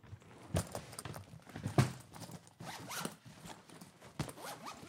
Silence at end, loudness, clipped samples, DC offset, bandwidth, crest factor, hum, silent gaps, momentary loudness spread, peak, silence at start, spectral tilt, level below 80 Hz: 0 s; -42 LUFS; under 0.1%; under 0.1%; 17 kHz; 28 dB; none; none; 19 LU; -14 dBFS; 0.05 s; -5 dB/octave; -62 dBFS